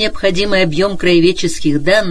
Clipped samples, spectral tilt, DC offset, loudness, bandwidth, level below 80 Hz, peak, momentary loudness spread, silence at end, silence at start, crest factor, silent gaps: under 0.1%; -5 dB/octave; under 0.1%; -13 LUFS; 11 kHz; -32 dBFS; 0 dBFS; 5 LU; 0 s; 0 s; 12 dB; none